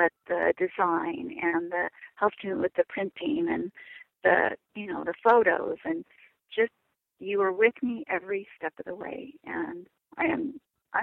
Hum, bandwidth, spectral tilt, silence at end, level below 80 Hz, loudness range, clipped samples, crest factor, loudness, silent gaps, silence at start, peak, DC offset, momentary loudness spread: none; 4.2 kHz; -8 dB/octave; 0 s; -68 dBFS; 4 LU; under 0.1%; 20 dB; -28 LUFS; none; 0 s; -8 dBFS; under 0.1%; 15 LU